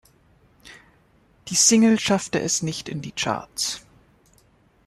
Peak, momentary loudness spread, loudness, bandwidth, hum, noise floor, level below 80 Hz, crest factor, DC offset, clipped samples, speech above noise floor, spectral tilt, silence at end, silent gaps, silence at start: -4 dBFS; 16 LU; -21 LUFS; 13.5 kHz; none; -59 dBFS; -58 dBFS; 20 dB; under 0.1%; under 0.1%; 37 dB; -3 dB/octave; 1.1 s; none; 0.65 s